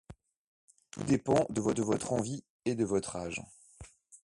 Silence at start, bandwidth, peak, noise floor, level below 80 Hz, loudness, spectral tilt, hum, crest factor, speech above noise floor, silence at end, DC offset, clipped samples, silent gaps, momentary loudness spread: 0.1 s; 11.5 kHz; -14 dBFS; -55 dBFS; -60 dBFS; -33 LUFS; -5.5 dB/octave; none; 20 dB; 23 dB; 0.05 s; under 0.1%; under 0.1%; 0.37-0.68 s, 2.49-2.59 s; 24 LU